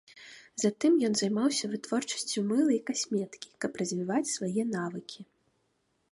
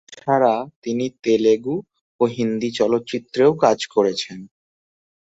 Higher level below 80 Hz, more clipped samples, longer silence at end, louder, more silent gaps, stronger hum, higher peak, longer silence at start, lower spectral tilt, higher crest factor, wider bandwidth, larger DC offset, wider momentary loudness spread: second, -76 dBFS vs -64 dBFS; neither; about the same, 0.9 s vs 0.9 s; second, -30 LUFS vs -20 LUFS; second, none vs 0.76-0.82 s, 2.01-2.19 s; neither; second, -14 dBFS vs -2 dBFS; about the same, 0.15 s vs 0.1 s; second, -4 dB/octave vs -5.5 dB/octave; about the same, 18 dB vs 18 dB; first, 11.5 kHz vs 8 kHz; neither; first, 16 LU vs 10 LU